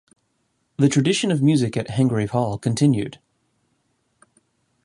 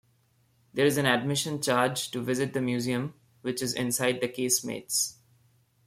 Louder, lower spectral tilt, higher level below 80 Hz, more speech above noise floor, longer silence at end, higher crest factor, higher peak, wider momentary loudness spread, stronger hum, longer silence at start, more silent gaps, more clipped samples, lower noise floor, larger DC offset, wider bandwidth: first, -20 LUFS vs -28 LUFS; first, -6 dB/octave vs -3.5 dB/octave; first, -56 dBFS vs -68 dBFS; first, 51 dB vs 39 dB; first, 1.7 s vs 0.75 s; about the same, 18 dB vs 20 dB; first, -4 dBFS vs -8 dBFS; about the same, 6 LU vs 7 LU; neither; about the same, 0.8 s vs 0.75 s; neither; neither; about the same, -70 dBFS vs -67 dBFS; neither; second, 11.5 kHz vs 16.5 kHz